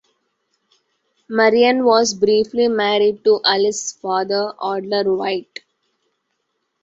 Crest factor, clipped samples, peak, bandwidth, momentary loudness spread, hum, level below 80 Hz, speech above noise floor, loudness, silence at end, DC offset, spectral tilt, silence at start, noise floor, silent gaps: 18 dB; under 0.1%; -2 dBFS; 8 kHz; 11 LU; none; -64 dBFS; 56 dB; -17 LUFS; 1.4 s; under 0.1%; -3 dB/octave; 1.3 s; -72 dBFS; none